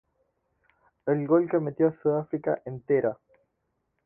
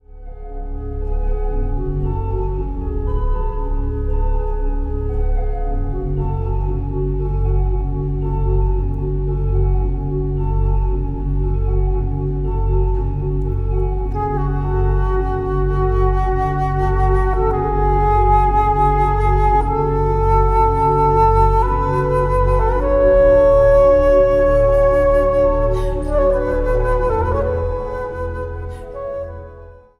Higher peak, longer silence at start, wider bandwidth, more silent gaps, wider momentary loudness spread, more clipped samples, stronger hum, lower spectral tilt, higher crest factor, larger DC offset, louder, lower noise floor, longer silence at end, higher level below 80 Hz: second, -10 dBFS vs -2 dBFS; first, 1.05 s vs 0.15 s; second, 2.9 kHz vs 4.2 kHz; neither; about the same, 9 LU vs 11 LU; neither; neither; first, -13 dB/octave vs -9.5 dB/octave; about the same, 18 dB vs 14 dB; neither; second, -27 LUFS vs -18 LUFS; first, -78 dBFS vs -39 dBFS; first, 0.9 s vs 0.3 s; second, -68 dBFS vs -20 dBFS